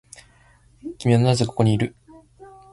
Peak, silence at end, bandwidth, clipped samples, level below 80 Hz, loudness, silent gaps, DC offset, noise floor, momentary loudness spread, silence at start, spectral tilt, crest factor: -6 dBFS; 0.3 s; 11.5 kHz; under 0.1%; -50 dBFS; -21 LUFS; none; under 0.1%; -55 dBFS; 17 LU; 0.85 s; -6.5 dB/octave; 18 dB